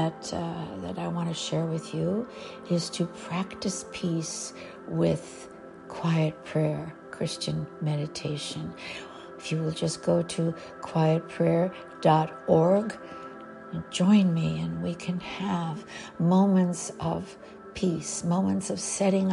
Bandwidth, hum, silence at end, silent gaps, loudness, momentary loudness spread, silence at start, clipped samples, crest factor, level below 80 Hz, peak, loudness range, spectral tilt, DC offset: 11.5 kHz; none; 0 s; none; -28 LUFS; 16 LU; 0 s; under 0.1%; 20 dB; -60 dBFS; -8 dBFS; 6 LU; -6 dB/octave; under 0.1%